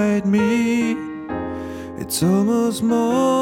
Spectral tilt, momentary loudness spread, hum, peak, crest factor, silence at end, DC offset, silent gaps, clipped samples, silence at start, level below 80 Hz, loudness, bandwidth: -5.5 dB/octave; 11 LU; none; -8 dBFS; 12 dB; 0 s; under 0.1%; none; under 0.1%; 0 s; -50 dBFS; -20 LUFS; 17.5 kHz